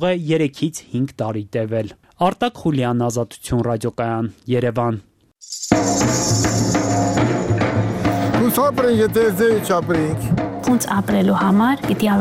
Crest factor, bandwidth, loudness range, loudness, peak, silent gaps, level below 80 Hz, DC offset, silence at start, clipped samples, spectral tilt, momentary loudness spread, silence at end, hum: 18 dB; 16 kHz; 4 LU; -19 LUFS; -2 dBFS; none; -44 dBFS; under 0.1%; 0 s; under 0.1%; -5.5 dB/octave; 8 LU; 0 s; none